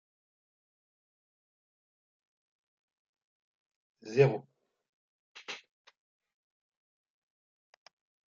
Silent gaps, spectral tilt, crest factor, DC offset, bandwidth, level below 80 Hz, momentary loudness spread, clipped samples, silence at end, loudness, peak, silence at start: 4.89-5.35 s; -6 dB/octave; 28 dB; under 0.1%; 7.2 kHz; -80 dBFS; 22 LU; under 0.1%; 2.75 s; -29 LUFS; -12 dBFS; 4.05 s